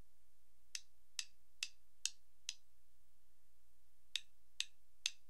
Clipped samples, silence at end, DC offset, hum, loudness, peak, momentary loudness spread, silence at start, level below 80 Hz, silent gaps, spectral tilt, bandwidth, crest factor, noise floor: under 0.1%; 0.15 s; 0.3%; none; -48 LUFS; -16 dBFS; 7 LU; 0.75 s; -82 dBFS; none; 3 dB/octave; 15.5 kHz; 38 dB; -79 dBFS